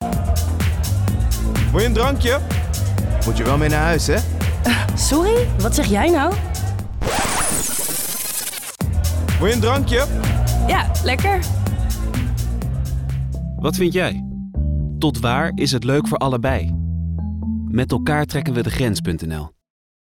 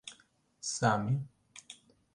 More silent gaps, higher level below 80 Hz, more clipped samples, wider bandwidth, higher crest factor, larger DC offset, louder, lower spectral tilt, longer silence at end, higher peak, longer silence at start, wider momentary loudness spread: neither; first, -26 dBFS vs -66 dBFS; neither; first, 19 kHz vs 11.5 kHz; second, 12 dB vs 24 dB; neither; first, -19 LUFS vs -33 LUFS; about the same, -5 dB/octave vs -4.5 dB/octave; first, 0.6 s vs 0.4 s; first, -8 dBFS vs -12 dBFS; about the same, 0 s vs 0.05 s; second, 7 LU vs 23 LU